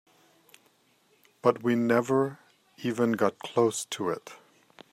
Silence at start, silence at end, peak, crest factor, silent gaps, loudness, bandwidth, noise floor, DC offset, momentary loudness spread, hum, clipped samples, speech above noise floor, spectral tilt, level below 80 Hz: 1.45 s; 0.55 s; -8 dBFS; 22 dB; none; -28 LUFS; 15.5 kHz; -66 dBFS; under 0.1%; 9 LU; none; under 0.1%; 40 dB; -5 dB/octave; -76 dBFS